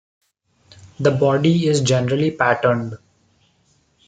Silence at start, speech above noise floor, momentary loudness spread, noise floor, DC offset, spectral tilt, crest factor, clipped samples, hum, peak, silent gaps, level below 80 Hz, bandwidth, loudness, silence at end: 0.85 s; 44 dB; 7 LU; -61 dBFS; under 0.1%; -6 dB/octave; 18 dB; under 0.1%; none; -2 dBFS; none; -60 dBFS; 9.4 kHz; -18 LUFS; 1.1 s